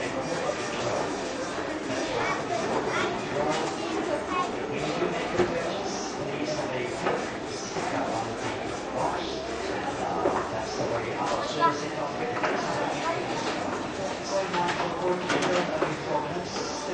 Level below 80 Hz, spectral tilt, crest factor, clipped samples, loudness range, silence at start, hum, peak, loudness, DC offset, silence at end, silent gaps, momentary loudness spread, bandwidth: -54 dBFS; -4 dB/octave; 18 dB; under 0.1%; 2 LU; 0 s; none; -10 dBFS; -29 LUFS; under 0.1%; 0 s; none; 5 LU; 10 kHz